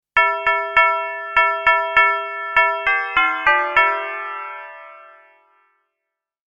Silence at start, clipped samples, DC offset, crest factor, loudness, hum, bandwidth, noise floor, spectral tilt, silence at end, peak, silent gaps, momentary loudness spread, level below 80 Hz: 0.15 s; under 0.1%; under 0.1%; 20 dB; -17 LUFS; none; 8.6 kHz; -82 dBFS; -2.5 dB/octave; 1.5 s; 0 dBFS; none; 13 LU; -52 dBFS